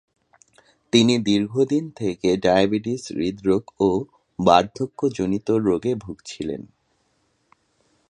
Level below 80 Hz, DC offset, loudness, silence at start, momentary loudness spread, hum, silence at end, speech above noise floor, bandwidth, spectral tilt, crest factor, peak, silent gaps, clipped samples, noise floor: -54 dBFS; under 0.1%; -21 LUFS; 0.95 s; 13 LU; none; 1.5 s; 47 dB; 11 kHz; -5.5 dB/octave; 22 dB; 0 dBFS; none; under 0.1%; -67 dBFS